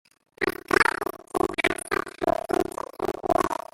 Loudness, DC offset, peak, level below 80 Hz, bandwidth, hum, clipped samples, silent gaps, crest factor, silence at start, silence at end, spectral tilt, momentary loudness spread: -26 LUFS; under 0.1%; -4 dBFS; -52 dBFS; 16.5 kHz; none; under 0.1%; none; 22 dB; 0.4 s; 0.2 s; -4 dB/octave; 10 LU